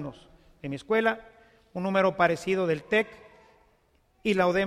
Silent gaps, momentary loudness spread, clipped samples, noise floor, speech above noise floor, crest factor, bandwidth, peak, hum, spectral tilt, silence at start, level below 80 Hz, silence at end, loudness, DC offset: none; 14 LU; under 0.1%; -66 dBFS; 40 dB; 20 dB; 14.5 kHz; -8 dBFS; none; -6 dB/octave; 0 s; -60 dBFS; 0 s; -27 LUFS; under 0.1%